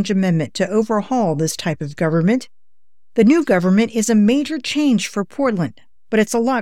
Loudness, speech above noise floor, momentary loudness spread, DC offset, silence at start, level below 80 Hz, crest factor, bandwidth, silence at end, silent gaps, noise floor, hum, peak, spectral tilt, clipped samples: -18 LUFS; 64 dB; 8 LU; 0.7%; 0 s; -54 dBFS; 14 dB; 14.5 kHz; 0 s; none; -80 dBFS; none; -4 dBFS; -5.5 dB/octave; under 0.1%